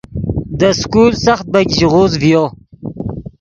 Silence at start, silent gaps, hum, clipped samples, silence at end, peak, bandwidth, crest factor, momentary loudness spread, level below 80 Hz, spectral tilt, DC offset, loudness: 0.1 s; none; none; under 0.1%; 0.1 s; 0 dBFS; 7.6 kHz; 14 dB; 14 LU; -34 dBFS; -5.5 dB/octave; under 0.1%; -12 LUFS